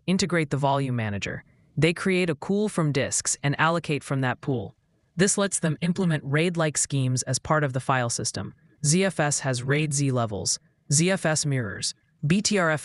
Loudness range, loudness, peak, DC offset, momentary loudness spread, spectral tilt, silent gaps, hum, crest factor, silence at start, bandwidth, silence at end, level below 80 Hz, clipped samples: 1 LU; -25 LUFS; -6 dBFS; under 0.1%; 8 LU; -4.5 dB/octave; none; none; 20 dB; 0.05 s; 12 kHz; 0 s; -58 dBFS; under 0.1%